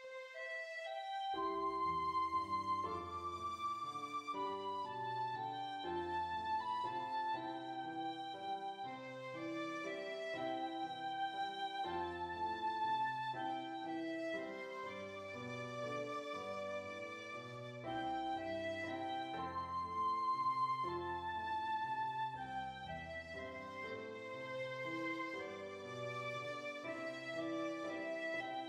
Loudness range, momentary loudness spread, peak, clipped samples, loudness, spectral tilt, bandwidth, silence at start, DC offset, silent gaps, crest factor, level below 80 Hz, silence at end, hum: 5 LU; 8 LU; -30 dBFS; under 0.1%; -42 LUFS; -5 dB/octave; 15.5 kHz; 0 s; under 0.1%; none; 14 dB; -74 dBFS; 0 s; none